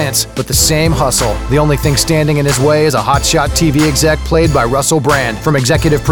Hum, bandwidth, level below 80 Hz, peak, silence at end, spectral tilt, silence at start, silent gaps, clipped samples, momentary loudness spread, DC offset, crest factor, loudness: none; 19 kHz; -24 dBFS; 0 dBFS; 0 s; -4.5 dB/octave; 0 s; none; under 0.1%; 3 LU; 0.7%; 12 dB; -11 LUFS